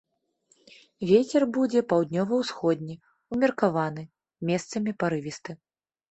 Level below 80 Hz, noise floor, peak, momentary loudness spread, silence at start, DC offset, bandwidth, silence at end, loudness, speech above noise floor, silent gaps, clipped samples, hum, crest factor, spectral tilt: -66 dBFS; -68 dBFS; -8 dBFS; 18 LU; 1 s; under 0.1%; 8.4 kHz; 0.55 s; -26 LUFS; 43 dB; none; under 0.1%; none; 20 dB; -6.5 dB/octave